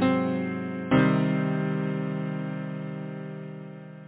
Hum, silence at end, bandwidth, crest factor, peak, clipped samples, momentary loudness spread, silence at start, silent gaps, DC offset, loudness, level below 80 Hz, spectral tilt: none; 0 s; 4 kHz; 18 dB; -10 dBFS; under 0.1%; 16 LU; 0 s; none; under 0.1%; -28 LUFS; -62 dBFS; -11.5 dB/octave